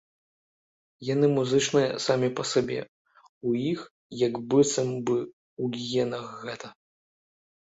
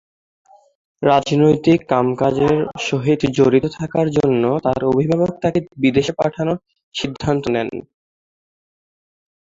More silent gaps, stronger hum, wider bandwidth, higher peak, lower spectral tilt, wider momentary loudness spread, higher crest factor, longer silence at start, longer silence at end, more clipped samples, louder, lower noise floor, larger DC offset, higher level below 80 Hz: first, 2.88-3.05 s, 3.29-3.41 s, 3.91-4.10 s, 5.33-5.57 s vs 6.83-6.92 s; neither; about the same, 8 kHz vs 7.8 kHz; second, -8 dBFS vs 0 dBFS; second, -5 dB/octave vs -7 dB/octave; first, 15 LU vs 8 LU; about the same, 20 dB vs 18 dB; about the same, 1 s vs 1 s; second, 1 s vs 1.75 s; neither; second, -27 LUFS vs -18 LUFS; about the same, under -90 dBFS vs under -90 dBFS; neither; second, -68 dBFS vs -48 dBFS